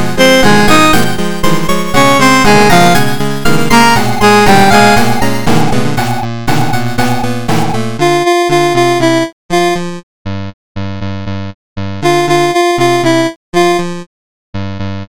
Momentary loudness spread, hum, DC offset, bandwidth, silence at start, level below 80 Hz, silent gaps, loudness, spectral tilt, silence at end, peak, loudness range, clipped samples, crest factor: 16 LU; none; 20%; over 20 kHz; 0 s; -30 dBFS; 9.33-9.49 s, 10.03-10.25 s, 10.54-10.75 s, 11.54-11.76 s, 13.36-13.53 s, 14.06-14.53 s; -10 LUFS; -4.5 dB/octave; 0.05 s; 0 dBFS; 7 LU; 0.1%; 12 dB